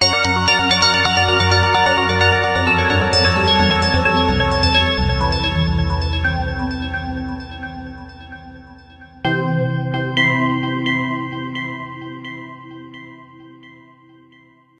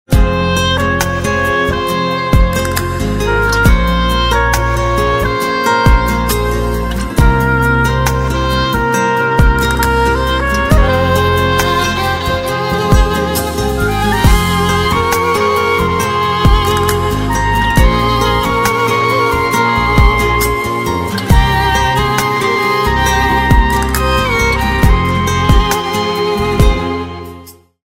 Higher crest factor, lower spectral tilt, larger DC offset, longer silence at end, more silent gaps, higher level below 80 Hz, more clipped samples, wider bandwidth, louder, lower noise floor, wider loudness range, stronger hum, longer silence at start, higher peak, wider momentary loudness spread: first, 18 dB vs 12 dB; about the same, -4.5 dB/octave vs -5 dB/octave; neither; first, 1.1 s vs 0.4 s; neither; second, -30 dBFS vs -18 dBFS; second, under 0.1% vs 0.3%; second, 11 kHz vs 16.5 kHz; second, -16 LUFS vs -13 LUFS; first, -51 dBFS vs -36 dBFS; first, 12 LU vs 1 LU; neither; about the same, 0 s vs 0.1 s; about the same, -2 dBFS vs 0 dBFS; first, 19 LU vs 4 LU